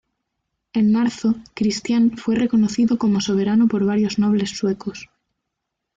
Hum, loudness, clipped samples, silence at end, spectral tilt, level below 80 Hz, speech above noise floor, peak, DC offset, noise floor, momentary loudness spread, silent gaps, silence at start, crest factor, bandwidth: none; -19 LUFS; under 0.1%; 0.9 s; -6 dB/octave; -56 dBFS; 61 dB; -10 dBFS; under 0.1%; -80 dBFS; 6 LU; none; 0.75 s; 10 dB; 7.8 kHz